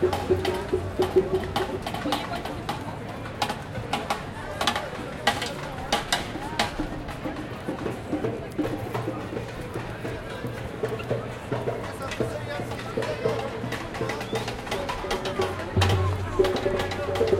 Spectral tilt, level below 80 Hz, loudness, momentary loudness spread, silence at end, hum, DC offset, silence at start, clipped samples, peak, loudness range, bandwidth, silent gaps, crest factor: -5 dB/octave; -44 dBFS; -29 LUFS; 9 LU; 0 s; none; under 0.1%; 0 s; under 0.1%; -4 dBFS; 5 LU; 16.5 kHz; none; 24 dB